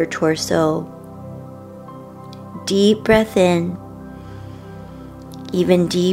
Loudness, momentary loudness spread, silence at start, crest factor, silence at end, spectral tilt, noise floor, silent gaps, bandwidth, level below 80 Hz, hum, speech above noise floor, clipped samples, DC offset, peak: -17 LUFS; 21 LU; 0 s; 18 dB; 0 s; -5.5 dB/octave; -36 dBFS; none; 16 kHz; -46 dBFS; none; 20 dB; under 0.1%; under 0.1%; 0 dBFS